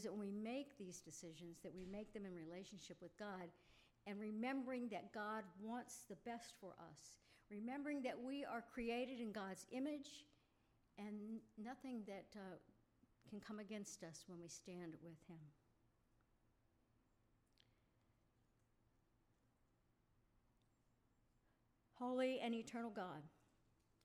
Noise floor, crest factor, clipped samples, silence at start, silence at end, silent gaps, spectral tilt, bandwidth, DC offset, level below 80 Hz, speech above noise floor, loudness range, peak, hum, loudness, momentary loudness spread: -81 dBFS; 20 dB; under 0.1%; 0 s; 0.75 s; none; -4.5 dB/octave; 15.5 kHz; under 0.1%; -82 dBFS; 30 dB; 8 LU; -32 dBFS; none; -51 LUFS; 14 LU